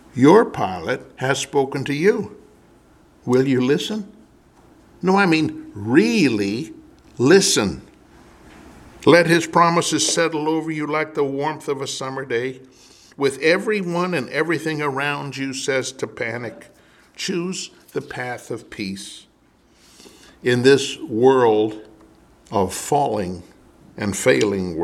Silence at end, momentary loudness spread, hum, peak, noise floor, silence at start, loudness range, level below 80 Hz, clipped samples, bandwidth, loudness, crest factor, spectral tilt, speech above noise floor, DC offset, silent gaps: 0 s; 15 LU; none; -2 dBFS; -56 dBFS; 0.15 s; 8 LU; -56 dBFS; under 0.1%; 15 kHz; -20 LUFS; 20 dB; -4.5 dB/octave; 37 dB; under 0.1%; none